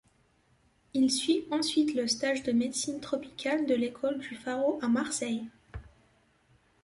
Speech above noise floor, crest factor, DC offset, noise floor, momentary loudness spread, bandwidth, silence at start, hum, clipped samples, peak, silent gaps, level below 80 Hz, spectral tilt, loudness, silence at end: 38 dB; 16 dB; under 0.1%; -68 dBFS; 9 LU; 11.5 kHz; 0.95 s; none; under 0.1%; -14 dBFS; none; -60 dBFS; -3 dB/octave; -30 LUFS; 1 s